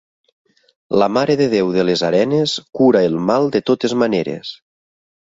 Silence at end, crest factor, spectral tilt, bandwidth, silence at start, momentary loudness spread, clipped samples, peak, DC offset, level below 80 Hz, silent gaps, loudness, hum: 0.75 s; 16 dB; -6 dB/octave; 7.8 kHz; 0.9 s; 6 LU; under 0.1%; 0 dBFS; under 0.1%; -58 dBFS; none; -16 LUFS; none